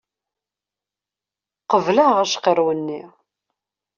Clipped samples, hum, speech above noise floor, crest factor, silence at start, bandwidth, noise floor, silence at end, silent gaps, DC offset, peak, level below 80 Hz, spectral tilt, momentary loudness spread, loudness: under 0.1%; 50 Hz at -50 dBFS; 71 dB; 20 dB; 1.7 s; 7.4 kHz; -89 dBFS; 0.9 s; none; under 0.1%; -2 dBFS; -70 dBFS; -3 dB/octave; 12 LU; -18 LUFS